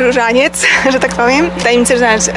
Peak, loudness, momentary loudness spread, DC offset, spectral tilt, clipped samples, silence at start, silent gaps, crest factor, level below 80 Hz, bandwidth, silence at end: 0 dBFS; -10 LUFS; 2 LU; under 0.1%; -3 dB/octave; under 0.1%; 0 s; none; 10 dB; -36 dBFS; 11.5 kHz; 0 s